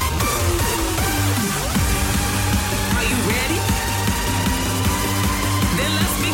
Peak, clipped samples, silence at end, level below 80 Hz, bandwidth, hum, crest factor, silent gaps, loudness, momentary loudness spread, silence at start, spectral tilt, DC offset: -8 dBFS; under 0.1%; 0 s; -28 dBFS; 17 kHz; none; 12 dB; none; -19 LUFS; 1 LU; 0 s; -4 dB/octave; under 0.1%